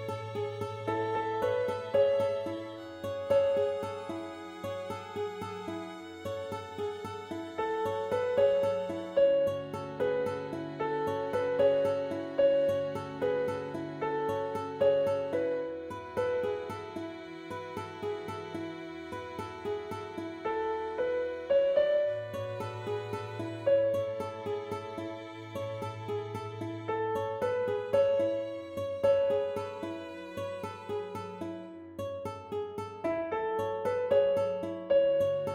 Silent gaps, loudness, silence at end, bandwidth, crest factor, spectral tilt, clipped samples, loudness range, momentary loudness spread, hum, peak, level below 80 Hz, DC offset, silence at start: none; -32 LUFS; 0 s; 14 kHz; 16 dB; -6.5 dB/octave; under 0.1%; 8 LU; 13 LU; none; -16 dBFS; -68 dBFS; under 0.1%; 0 s